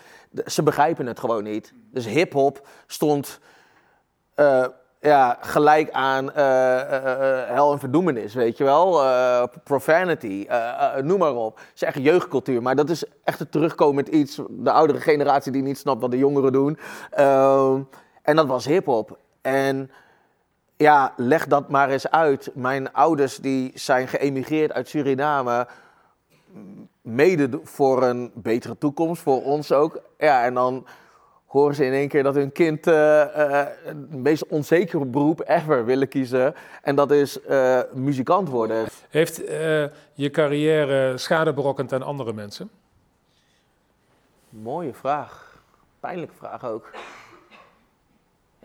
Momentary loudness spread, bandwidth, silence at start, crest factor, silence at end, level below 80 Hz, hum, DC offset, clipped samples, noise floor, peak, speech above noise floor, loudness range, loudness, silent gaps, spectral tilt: 13 LU; 18.5 kHz; 0.35 s; 20 dB; 1.5 s; -72 dBFS; none; under 0.1%; under 0.1%; -67 dBFS; 0 dBFS; 46 dB; 7 LU; -21 LUFS; none; -6 dB/octave